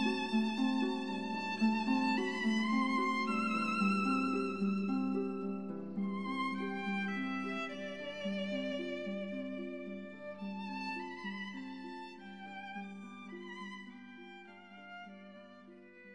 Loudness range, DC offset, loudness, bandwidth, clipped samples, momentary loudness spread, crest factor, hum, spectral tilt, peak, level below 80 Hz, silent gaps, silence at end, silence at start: 15 LU; 0.1%; -36 LUFS; 11 kHz; under 0.1%; 19 LU; 16 dB; none; -6 dB/octave; -20 dBFS; -82 dBFS; none; 0 s; 0 s